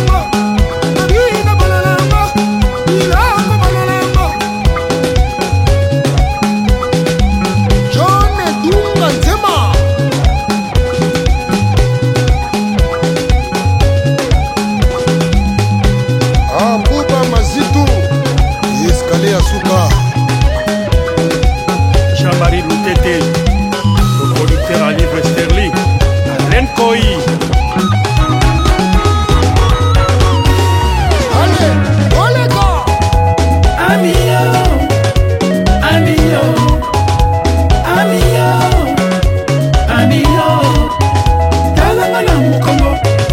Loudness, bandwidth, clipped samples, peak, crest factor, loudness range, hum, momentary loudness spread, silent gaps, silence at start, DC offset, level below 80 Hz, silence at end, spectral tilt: -11 LUFS; 16.5 kHz; under 0.1%; 0 dBFS; 10 dB; 2 LU; none; 3 LU; none; 0 s; under 0.1%; -16 dBFS; 0 s; -6 dB/octave